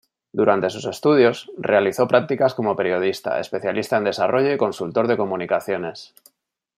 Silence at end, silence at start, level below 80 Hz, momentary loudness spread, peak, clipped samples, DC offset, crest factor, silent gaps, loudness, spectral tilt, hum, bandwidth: 0.7 s; 0.35 s; -68 dBFS; 8 LU; -2 dBFS; under 0.1%; under 0.1%; 18 dB; none; -20 LUFS; -6 dB/octave; none; 15 kHz